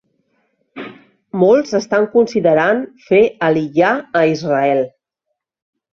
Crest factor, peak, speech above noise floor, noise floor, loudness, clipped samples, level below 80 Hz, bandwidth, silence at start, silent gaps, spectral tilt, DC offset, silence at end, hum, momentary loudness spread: 16 dB; 0 dBFS; 62 dB; -76 dBFS; -15 LUFS; under 0.1%; -58 dBFS; 7.4 kHz; 0.75 s; none; -6.5 dB/octave; under 0.1%; 1.05 s; none; 14 LU